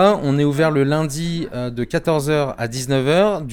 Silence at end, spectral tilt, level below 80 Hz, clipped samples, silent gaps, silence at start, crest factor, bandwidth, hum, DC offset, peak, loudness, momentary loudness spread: 0 s; -6 dB/octave; -44 dBFS; under 0.1%; none; 0 s; 16 dB; 18 kHz; none; under 0.1%; -2 dBFS; -19 LUFS; 8 LU